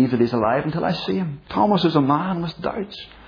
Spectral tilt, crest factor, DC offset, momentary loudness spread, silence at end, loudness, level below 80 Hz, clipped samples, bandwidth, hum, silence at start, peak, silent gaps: -8.5 dB/octave; 16 dB; under 0.1%; 9 LU; 0 s; -21 LUFS; -52 dBFS; under 0.1%; 5.4 kHz; none; 0 s; -4 dBFS; none